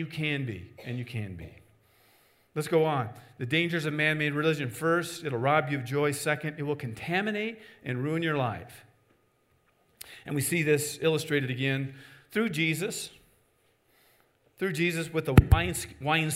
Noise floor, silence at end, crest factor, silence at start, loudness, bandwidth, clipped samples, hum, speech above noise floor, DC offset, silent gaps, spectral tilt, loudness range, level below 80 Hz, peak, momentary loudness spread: -69 dBFS; 0 s; 28 dB; 0 s; -29 LUFS; 16 kHz; under 0.1%; none; 40 dB; under 0.1%; none; -5 dB/octave; 5 LU; -44 dBFS; -2 dBFS; 13 LU